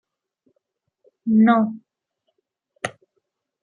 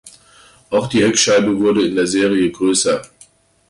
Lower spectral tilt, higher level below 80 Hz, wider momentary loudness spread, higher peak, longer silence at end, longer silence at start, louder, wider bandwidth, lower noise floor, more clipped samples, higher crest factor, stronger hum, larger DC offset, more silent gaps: first, -7 dB/octave vs -3.5 dB/octave; second, -72 dBFS vs -52 dBFS; first, 17 LU vs 7 LU; second, -6 dBFS vs -2 dBFS; about the same, 0.75 s vs 0.65 s; first, 1.25 s vs 0.05 s; second, -20 LUFS vs -15 LUFS; about the same, 10.5 kHz vs 11.5 kHz; first, -76 dBFS vs -49 dBFS; neither; first, 20 dB vs 14 dB; neither; neither; neither